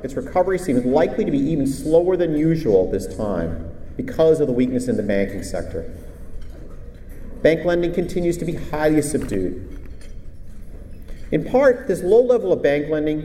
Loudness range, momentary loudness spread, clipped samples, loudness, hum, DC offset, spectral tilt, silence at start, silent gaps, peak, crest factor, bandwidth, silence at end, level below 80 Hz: 5 LU; 24 LU; under 0.1%; -20 LUFS; none; under 0.1%; -6.5 dB/octave; 0 s; none; -4 dBFS; 16 dB; 15.5 kHz; 0 s; -36 dBFS